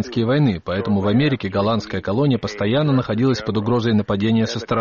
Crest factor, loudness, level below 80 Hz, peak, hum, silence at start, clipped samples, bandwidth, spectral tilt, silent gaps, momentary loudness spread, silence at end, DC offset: 12 dB; -19 LUFS; -48 dBFS; -8 dBFS; none; 0 s; under 0.1%; 7.2 kHz; -6 dB/octave; none; 4 LU; 0 s; under 0.1%